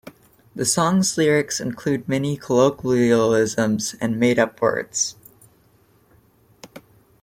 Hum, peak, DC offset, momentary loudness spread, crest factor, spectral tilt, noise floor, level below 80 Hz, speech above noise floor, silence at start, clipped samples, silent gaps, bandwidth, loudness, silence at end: none; -4 dBFS; under 0.1%; 7 LU; 18 dB; -4.5 dB/octave; -57 dBFS; -58 dBFS; 38 dB; 0.55 s; under 0.1%; none; 16.5 kHz; -20 LUFS; 0.45 s